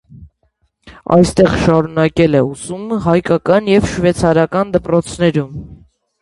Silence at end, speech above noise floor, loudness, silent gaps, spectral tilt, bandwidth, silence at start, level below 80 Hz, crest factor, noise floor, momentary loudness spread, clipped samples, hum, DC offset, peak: 0.45 s; 49 dB; -14 LUFS; none; -6.5 dB/octave; 11.5 kHz; 0.2 s; -36 dBFS; 14 dB; -62 dBFS; 9 LU; under 0.1%; none; under 0.1%; 0 dBFS